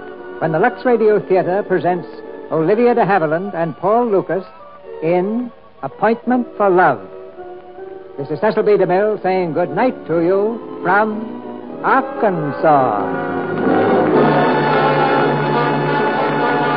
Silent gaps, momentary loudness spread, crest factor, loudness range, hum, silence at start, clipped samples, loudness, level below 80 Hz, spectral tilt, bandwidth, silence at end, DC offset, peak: none; 17 LU; 14 dB; 4 LU; none; 0 s; under 0.1%; -16 LUFS; -60 dBFS; -12 dB/octave; 5.4 kHz; 0 s; 0.6%; -2 dBFS